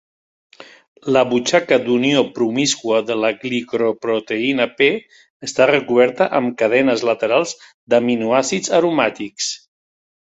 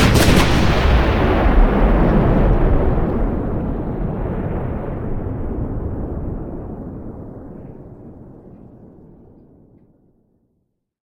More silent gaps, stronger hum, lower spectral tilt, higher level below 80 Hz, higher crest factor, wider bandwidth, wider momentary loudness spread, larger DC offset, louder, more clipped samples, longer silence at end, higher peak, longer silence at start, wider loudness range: first, 0.88-0.96 s, 5.30-5.40 s, 7.74-7.87 s vs none; neither; second, -3.5 dB/octave vs -6 dB/octave; second, -62 dBFS vs -22 dBFS; about the same, 16 dB vs 16 dB; second, 8.4 kHz vs 18 kHz; second, 8 LU vs 20 LU; neither; about the same, -17 LUFS vs -18 LUFS; neither; second, 0.7 s vs 2.3 s; about the same, -2 dBFS vs -2 dBFS; first, 0.6 s vs 0 s; second, 2 LU vs 21 LU